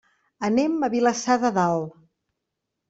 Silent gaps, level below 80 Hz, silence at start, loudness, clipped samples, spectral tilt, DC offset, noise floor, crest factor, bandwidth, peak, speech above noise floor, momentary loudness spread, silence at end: none; -66 dBFS; 0.4 s; -23 LUFS; under 0.1%; -5 dB/octave; under 0.1%; -82 dBFS; 18 dB; 8 kHz; -6 dBFS; 60 dB; 8 LU; 1 s